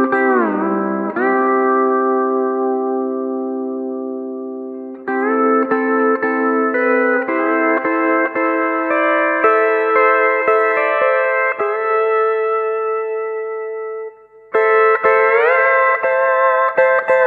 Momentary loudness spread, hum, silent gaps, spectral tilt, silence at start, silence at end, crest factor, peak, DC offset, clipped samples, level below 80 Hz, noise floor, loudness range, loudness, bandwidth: 11 LU; none; none; -7.5 dB/octave; 0 s; 0 s; 14 dB; 0 dBFS; under 0.1%; under 0.1%; -70 dBFS; -36 dBFS; 5 LU; -16 LUFS; 4.7 kHz